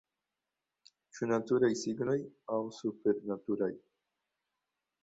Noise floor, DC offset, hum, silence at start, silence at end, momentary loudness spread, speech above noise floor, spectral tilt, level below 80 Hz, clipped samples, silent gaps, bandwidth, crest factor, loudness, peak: -89 dBFS; under 0.1%; none; 1.15 s; 1.25 s; 9 LU; 56 dB; -6 dB/octave; -76 dBFS; under 0.1%; none; 8 kHz; 18 dB; -34 LUFS; -18 dBFS